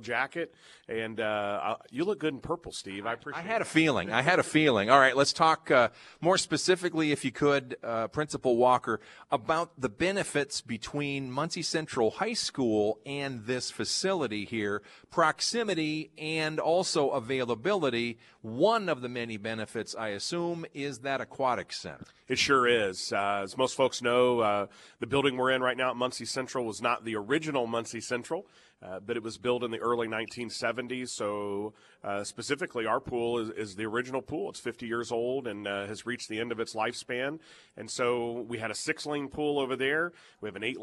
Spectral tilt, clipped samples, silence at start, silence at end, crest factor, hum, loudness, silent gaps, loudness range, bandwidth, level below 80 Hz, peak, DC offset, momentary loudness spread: -4 dB/octave; under 0.1%; 0 s; 0 s; 26 dB; none; -30 LUFS; none; 8 LU; 12.5 kHz; -66 dBFS; -4 dBFS; under 0.1%; 11 LU